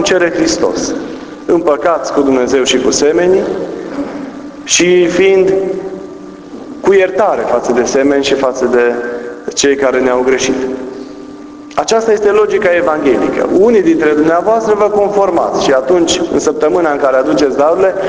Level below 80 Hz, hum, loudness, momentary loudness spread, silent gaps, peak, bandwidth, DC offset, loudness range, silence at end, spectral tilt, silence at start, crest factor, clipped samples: -44 dBFS; none; -11 LUFS; 14 LU; none; 0 dBFS; 8 kHz; under 0.1%; 3 LU; 0 s; -3.5 dB/octave; 0 s; 12 dB; under 0.1%